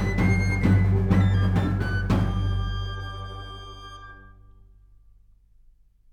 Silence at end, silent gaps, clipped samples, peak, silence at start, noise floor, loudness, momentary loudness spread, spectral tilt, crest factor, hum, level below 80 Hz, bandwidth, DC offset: 1.85 s; none; under 0.1%; -8 dBFS; 0 s; -56 dBFS; -24 LUFS; 20 LU; -7.5 dB/octave; 18 dB; none; -34 dBFS; 6.8 kHz; under 0.1%